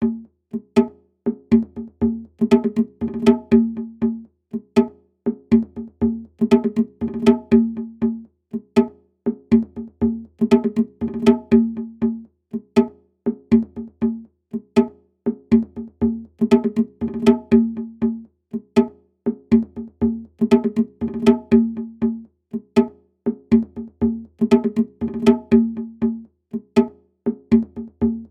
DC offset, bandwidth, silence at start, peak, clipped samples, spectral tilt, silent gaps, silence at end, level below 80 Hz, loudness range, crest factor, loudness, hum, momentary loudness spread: under 0.1%; 8.6 kHz; 0 s; 0 dBFS; under 0.1%; -8 dB/octave; none; 0.05 s; -46 dBFS; 2 LU; 20 dB; -20 LUFS; none; 14 LU